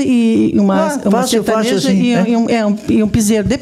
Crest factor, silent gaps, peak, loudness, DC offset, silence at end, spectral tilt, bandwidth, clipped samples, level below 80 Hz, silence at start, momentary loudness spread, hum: 10 dB; none; -2 dBFS; -13 LUFS; under 0.1%; 0 s; -5.5 dB/octave; 15 kHz; under 0.1%; -38 dBFS; 0 s; 2 LU; none